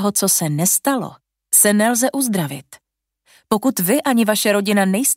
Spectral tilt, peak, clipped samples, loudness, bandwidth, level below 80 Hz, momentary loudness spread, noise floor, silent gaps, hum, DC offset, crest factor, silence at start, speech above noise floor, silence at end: -3.5 dB/octave; 0 dBFS; under 0.1%; -16 LUFS; 16.5 kHz; -64 dBFS; 10 LU; -62 dBFS; none; none; under 0.1%; 18 dB; 0 s; 45 dB; 0 s